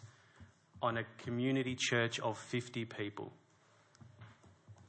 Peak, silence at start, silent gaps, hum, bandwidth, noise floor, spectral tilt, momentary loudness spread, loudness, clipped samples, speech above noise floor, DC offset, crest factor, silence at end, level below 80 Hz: -20 dBFS; 0 s; none; none; 8.4 kHz; -68 dBFS; -4.5 dB/octave; 24 LU; -37 LUFS; under 0.1%; 31 dB; under 0.1%; 20 dB; 0 s; -78 dBFS